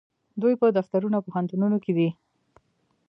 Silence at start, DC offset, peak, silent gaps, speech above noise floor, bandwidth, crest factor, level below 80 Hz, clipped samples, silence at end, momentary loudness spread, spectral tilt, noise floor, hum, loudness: 0.35 s; under 0.1%; -8 dBFS; none; 47 dB; 5.4 kHz; 16 dB; -74 dBFS; under 0.1%; 0.95 s; 6 LU; -10.5 dB/octave; -70 dBFS; none; -25 LUFS